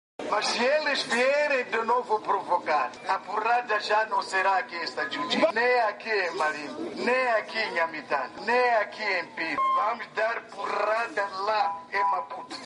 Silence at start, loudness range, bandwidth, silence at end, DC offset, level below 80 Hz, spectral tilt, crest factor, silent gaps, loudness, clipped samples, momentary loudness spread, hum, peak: 0.2 s; 2 LU; 10.5 kHz; 0 s; under 0.1%; -76 dBFS; -2.5 dB/octave; 16 dB; none; -26 LUFS; under 0.1%; 7 LU; none; -10 dBFS